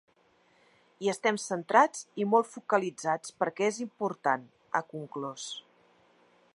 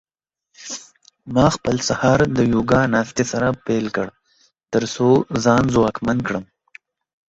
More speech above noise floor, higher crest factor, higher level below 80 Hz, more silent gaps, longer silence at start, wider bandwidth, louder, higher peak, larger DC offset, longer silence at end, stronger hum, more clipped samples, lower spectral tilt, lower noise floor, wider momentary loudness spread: second, 37 dB vs 55 dB; first, 24 dB vs 18 dB; second, -86 dBFS vs -44 dBFS; neither; first, 1 s vs 0.6 s; first, 11.5 kHz vs 8 kHz; second, -30 LUFS vs -19 LUFS; second, -8 dBFS vs -2 dBFS; neither; about the same, 0.95 s vs 0.85 s; neither; neither; second, -4 dB/octave vs -5.5 dB/octave; second, -66 dBFS vs -73 dBFS; about the same, 13 LU vs 13 LU